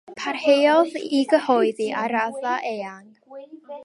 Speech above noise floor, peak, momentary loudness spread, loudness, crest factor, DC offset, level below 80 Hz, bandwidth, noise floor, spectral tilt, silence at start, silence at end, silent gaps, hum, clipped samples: 21 dB; -6 dBFS; 18 LU; -21 LUFS; 16 dB; under 0.1%; -78 dBFS; 11.5 kHz; -42 dBFS; -4 dB/octave; 0.1 s; 0 s; none; none; under 0.1%